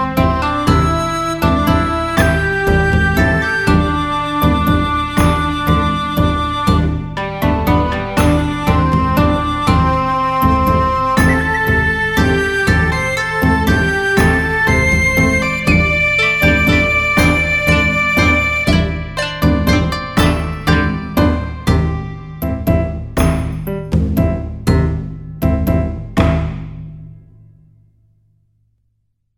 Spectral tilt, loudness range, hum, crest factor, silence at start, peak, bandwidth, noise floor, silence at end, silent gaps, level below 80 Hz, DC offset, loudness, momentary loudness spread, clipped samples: -6 dB/octave; 6 LU; none; 14 dB; 0 s; 0 dBFS; 17.5 kHz; -64 dBFS; 2.2 s; none; -24 dBFS; under 0.1%; -14 LUFS; 8 LU; under 0.1%